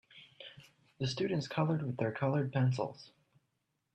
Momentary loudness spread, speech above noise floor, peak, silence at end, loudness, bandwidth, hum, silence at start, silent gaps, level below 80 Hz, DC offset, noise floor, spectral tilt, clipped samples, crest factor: 19 LU; 49 dB; -18 dBFS; 0.85 s; -35 LUFS; 8.6 kHz; none; 0.15 s; none; -72 dBFS; under 0.1%; -82 dBFS; -7 dB/octave; under 0.1%; 18 dB